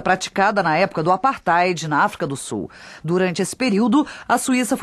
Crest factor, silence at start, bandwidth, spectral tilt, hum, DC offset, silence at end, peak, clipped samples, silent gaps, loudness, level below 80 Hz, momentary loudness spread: 16 dB; 0 s; 13 kHz; -4.5 dB/octave; none; under 0.1%; 0 s; -4 dBFS; under 0.1%; none; -19 LUFS; -56 dBFS; 9 LU